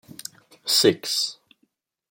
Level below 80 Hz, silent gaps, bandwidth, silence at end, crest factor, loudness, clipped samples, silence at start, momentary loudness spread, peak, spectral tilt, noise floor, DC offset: -74 dBFS; none; 17 kHz; 0.8 s; 22 dB; -21 LUFS; under 0.1%; 0.65 s; 21 LU; -4 dBFS; -2.5 dB/octave; -70 dBFS; under 0.1%